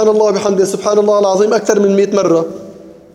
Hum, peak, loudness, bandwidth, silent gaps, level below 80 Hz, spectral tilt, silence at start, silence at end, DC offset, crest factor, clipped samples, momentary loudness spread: none; 0 dBFS; -12 LUFS; 12.5 kHz; none; -58 dBFS; -5 dB/octave; 0 s; 0.2 s; under 0.1%; 12 dB; under 0.1%; 4 LU